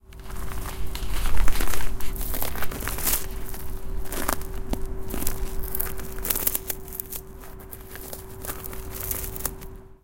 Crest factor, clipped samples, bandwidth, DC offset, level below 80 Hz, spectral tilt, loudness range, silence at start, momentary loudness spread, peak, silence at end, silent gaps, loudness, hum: 22 dB; under 0.1%; 17.5 kHz; under 0.1%; -30 dBFS; -3 dB/octave; 3 LU; 0.15 s; 13 LU; -2 dBFS; 0.15 s; none; -30 LUFS; none